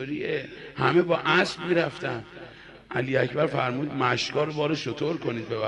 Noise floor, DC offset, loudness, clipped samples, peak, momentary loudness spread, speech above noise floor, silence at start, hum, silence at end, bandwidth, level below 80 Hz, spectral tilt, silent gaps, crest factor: -46 dBFS; under 0.1%; -26 LUFS; under 0.1%; -8 dBFS; 11 LU; 20 dB; 0 s; none; 0 s; 10.5 kHz; -60 dBFS; -5.5 dB/octave; none; 18 dB